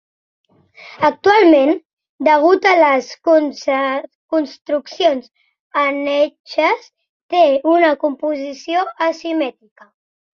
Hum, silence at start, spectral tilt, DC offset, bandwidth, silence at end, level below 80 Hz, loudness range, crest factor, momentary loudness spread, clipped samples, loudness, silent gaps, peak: none; 0.8 s; -4 dB/octave; under 0.1%; 7 kHz; 0.85 s; -64 dBFS; 5 LU; 14 dB; 11 LU; under 0.1%; -16 LUFS; 1.85-1.97 s, 2.09-2.19 s, 4.15-4.29 s, 5.60-5.71 s, 6.40-6.44 s, 7.09-7.29 s; -2 dBFS